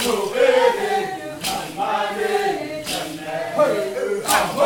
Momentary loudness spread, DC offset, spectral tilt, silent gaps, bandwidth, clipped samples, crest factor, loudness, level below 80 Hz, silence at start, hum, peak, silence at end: 9 LU; under 0.1%; -2.5 dB/octave; none; 18 kHz; under 0.1%; 16 dB; -21 LUFS; -54 dBFS; 0 s; none; -4 dBFS; 0 s